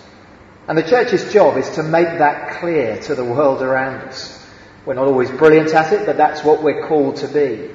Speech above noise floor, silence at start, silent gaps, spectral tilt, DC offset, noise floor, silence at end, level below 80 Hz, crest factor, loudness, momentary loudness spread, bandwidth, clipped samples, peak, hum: 27 dB; 0.7 s; none; -6 dB/octave; under 0.1%; -42 dBFS; 0 s; -54 dBFS; 16 dB; -15 LUFS; 12 LU; 7.6 kHz; under 0.1%; 0 dBFS; none